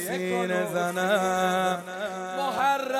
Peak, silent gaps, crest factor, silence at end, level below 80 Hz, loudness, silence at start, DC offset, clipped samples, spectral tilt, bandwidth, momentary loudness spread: -12 dBFS; none; 16 dB; 0 s; -70 dBFS; -26 LUFS; 0 s; under 0.1%; under 0.1%; -4 dB/octave; 16 kHz; 7 LU